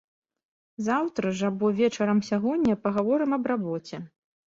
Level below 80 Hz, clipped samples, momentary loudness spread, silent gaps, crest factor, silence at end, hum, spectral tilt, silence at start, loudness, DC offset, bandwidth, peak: -62 dBFS; under 0.1%; 9 LU; none; 14 dB; 0.45 s; none; -6.5 dB/octave; 0.8 s; -26 LUFS; under 0.1%; 7.6 kHz; -12 dBFS